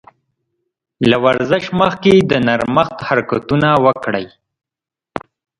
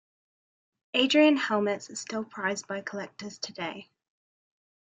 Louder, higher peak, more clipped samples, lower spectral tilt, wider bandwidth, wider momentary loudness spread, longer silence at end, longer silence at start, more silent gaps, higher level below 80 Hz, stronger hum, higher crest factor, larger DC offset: first, -14 LUFS vs -28 LUFS; first, 0 dBFS vs -10 dBFS; neither; first, -7 dB/octave vs -3.5 dB/octave; first, 11 kHz vs 9.4 kHz; about the same, 18 LU vs 16 LU; second, 0.4 s vs 1 s; about the same, 1 s vs 0.95 s; neither; first, -48 dBFS vs -76 dBFS; neither; about the same, 16 dB vs 20 dB; neither